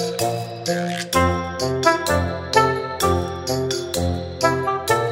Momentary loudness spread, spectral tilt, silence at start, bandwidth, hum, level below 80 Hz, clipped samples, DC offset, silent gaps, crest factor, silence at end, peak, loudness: 6 LU; -4.5 dB/octave; 0 s; 16.5 kHz; none; -40 dBFS; under 0.1%; under 0.1%; none; 20 dB; 0 s; -2 dBFS; -21 LUFS